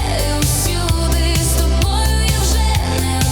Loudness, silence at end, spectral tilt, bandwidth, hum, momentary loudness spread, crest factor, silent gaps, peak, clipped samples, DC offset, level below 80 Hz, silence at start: -16 LUFS; 0 s; -4 dB/octave; over 20 kHz; none; 2 LU; 12 dB; none; -2 dBFS; under 0.1%; under 0.1%; -18 dBFS; 0 s